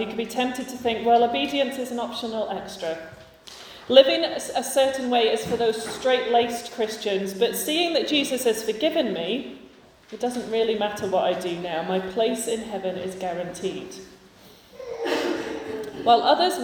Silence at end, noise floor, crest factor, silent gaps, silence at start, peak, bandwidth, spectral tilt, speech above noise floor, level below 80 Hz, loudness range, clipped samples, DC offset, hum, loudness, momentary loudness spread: 0 s; -50 dBFS; 24 dB; none; 0 s; 0 dBFS; 19.5 kHz; -3.5 dB/octave; 27 dB; -60 dBFS; 7 LU; under 0.1%; under 0.1%; none; -24 LUFS; 12 LU